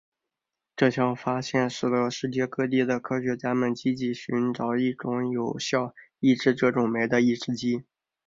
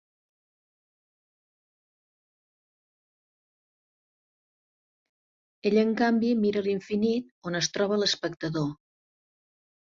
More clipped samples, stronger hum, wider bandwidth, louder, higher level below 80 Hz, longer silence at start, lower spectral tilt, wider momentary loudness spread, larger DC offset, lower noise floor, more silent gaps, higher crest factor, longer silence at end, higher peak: neither; neither; about the same, 7.6 kHz vs 7.6 kHz; about the same, -26 LUFS vs -27 LUFS; about the same, -66 dBFS vs -70 dBFS; second, 0.75 s vs 5.65 s; first, -6 dB/octave vs -4.5 dB/octave; about the same, 6 LU vs 8 LU; neither; about the same, -87 dBFS vs under -90 dBFS; second, none vs 7.31-7.42 s; about the same, 20 dB vs 20 dB; second, 0.45 s vs 1.15 s; first, -8 dBFS vs -12 dBFS